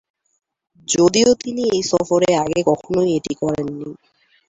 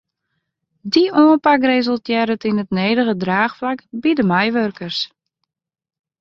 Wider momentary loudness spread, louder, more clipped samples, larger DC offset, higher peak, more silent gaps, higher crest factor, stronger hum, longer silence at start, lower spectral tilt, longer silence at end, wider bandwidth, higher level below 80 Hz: about the same, 12 LU vs 11 LU; about the same, -18 LUFS vs -17 LUFS; neither; neither; about the same, -2 dBFS vs -2 dBFS; neither; about the same, 16 dB vs 16 dB; neither; about the same, 0.9 s vs 0.85 s; second, -4.5 dB/octave vs -6.5 dB/octave; second, 0.55 s vs 1.15 s; first, 8.2 kHz vs 7 kHz; first, -52 dBFS vs -60 dBFS